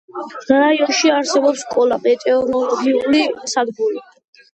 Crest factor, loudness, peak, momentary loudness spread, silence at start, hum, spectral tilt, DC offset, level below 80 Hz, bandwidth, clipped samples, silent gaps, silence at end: 16 dB; -16 LUFS; 0 dBFS; 8 LU; 0.15 s; none; -2.5 dB/octave; under 0.1%; -60 dBFS; 8.8 kHz; under 0.1%; none; 0.5 s